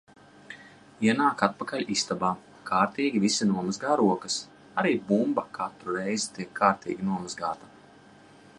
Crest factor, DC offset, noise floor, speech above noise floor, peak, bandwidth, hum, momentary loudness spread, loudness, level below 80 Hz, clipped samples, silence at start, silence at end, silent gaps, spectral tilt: 24 dB; under 0.1%; -53 dBFS; 26 dB; -4 dBFS; 11.5 kHz; none; 10 LU; -27 LUFS; -68 dBFS; under 0.1%; 0.5 s; 0.95 s; none; -4.5 dB/octave